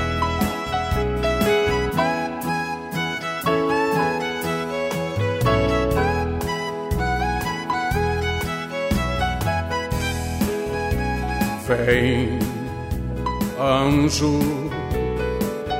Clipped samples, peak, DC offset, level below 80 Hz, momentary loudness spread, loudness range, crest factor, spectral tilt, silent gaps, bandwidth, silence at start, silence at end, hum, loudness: under 0.1%; -6 dBFS; under 0.1%; -32 dBFS; 7 LU; 2 LU; 16 dB; -5.5 dB/octave; none; 16.5 kHz; 0 s; 0 s; none; -22 LUFS